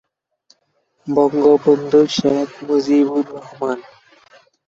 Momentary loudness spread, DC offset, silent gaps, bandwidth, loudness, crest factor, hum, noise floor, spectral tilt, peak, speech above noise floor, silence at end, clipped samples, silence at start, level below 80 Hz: 12 LU; under 0.1%; none; 7.8 kHz; -16 LUFS; 16 dB; none; -65 dBFS; -6 dB/octave; -2 dBFS; 49 dB; 0.85 s; under 0.1%; 1.05 s; -60 dBFS